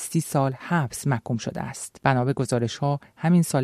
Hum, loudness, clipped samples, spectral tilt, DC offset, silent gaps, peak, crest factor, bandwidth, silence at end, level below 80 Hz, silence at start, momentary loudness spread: none; -25 LUFS; under 0.1%; -6 dB/octave; under 0.1%; none; -6 dBFS; 18 dB; 14.5 kHz; 0 s; -58 dBFS; 0 s; 8 LU